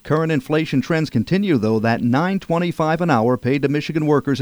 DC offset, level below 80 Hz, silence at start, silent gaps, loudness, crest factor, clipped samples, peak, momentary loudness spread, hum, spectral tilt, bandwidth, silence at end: under 0.1%; -52 dBFS; 0.05 s; none; -19 LUFS; 14 dB; under 0.1%; -4 dBFS; 3 LU; none; -7.5 dB/octave; over 20 kHz; 0 s